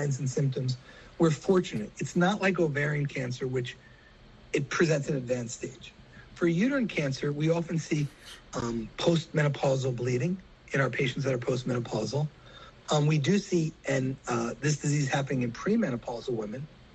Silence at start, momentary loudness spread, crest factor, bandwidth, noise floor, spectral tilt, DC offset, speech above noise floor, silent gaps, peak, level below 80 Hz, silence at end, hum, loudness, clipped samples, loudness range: 0 s; 10 LU; 18 dB; 8.6 kHz; -54 dBFS; -6 dB/octave; under 0.1%; 25 dB; none; -10 dBFS; -58 dBFS; 0.1 s; none; -29 LUFS; under 0.1%; 2 LU